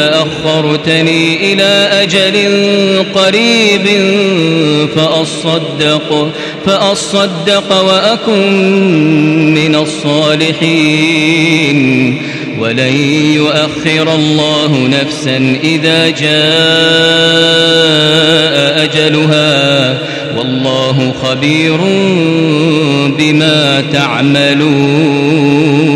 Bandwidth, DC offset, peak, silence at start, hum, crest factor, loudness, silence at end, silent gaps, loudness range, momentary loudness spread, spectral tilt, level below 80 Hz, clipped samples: 12 kHz; under 0.1%; 0 dBFS; 0 s; none; 10 dB; -9 LUFS; 0 s; none; 3 LU; 5 LU; -5 dB/octave; -50 dBFS; 0.3%